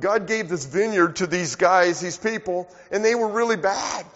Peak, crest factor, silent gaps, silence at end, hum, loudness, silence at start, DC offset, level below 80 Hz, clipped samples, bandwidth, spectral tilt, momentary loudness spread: -4 dBFS; 18 dB; none; 0.05 s; none; -22 LUFS; 0 s; under 0.1%; -60 dBFS; under 0.1%; 8 kHz; -3.5 dB/octave; 8 LU